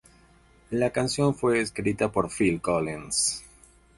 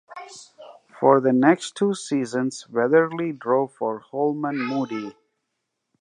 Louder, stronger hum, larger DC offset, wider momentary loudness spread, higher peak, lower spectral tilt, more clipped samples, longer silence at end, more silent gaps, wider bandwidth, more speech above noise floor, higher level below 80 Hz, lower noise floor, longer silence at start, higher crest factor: second, -26 LUFS vs -22 LUFS; neither; neither; second, 4 LU vs 16 LU; second, -8 dBFS vs -2 dBFS; second, -4 dB/octave vs -6 dB/octave; neither; second, 0.5 s vs 0.9 s; neither; about the same, 11.5 kHz vs 10.5 kHz; second, 32 dB vs 57 dB; first, -52 dBFS vs -78 dBFS; second, -57 dBFS vs -79 dBFS; first, 0.7 s vs 0.1 s; about the same, 20 dB vs 22 dB